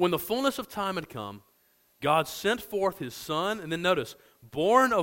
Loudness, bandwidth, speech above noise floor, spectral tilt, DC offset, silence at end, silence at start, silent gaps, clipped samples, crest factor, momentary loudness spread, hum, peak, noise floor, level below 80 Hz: -28 LUFS; 16.5 kHz; 39 dB; -4.5 dB/octave; under 0.1%; 0 s; 0 s; none; under 0.1%; 20 dB; 15 LU; none; -8 dBFS; -66 dBFS; -62 dBFS